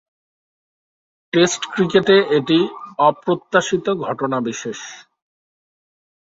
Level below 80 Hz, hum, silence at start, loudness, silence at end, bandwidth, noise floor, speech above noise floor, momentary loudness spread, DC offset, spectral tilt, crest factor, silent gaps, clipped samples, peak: -62 dBFS; none; 1.35 s; -18 LUFS; 1.25 s; 7.8 kHz; under -90 dBFS; over 73 dB; 12 LU; under 0.1%; -4.5 dB/octave; 20 dB; none; under 0.1%; 0 dBFS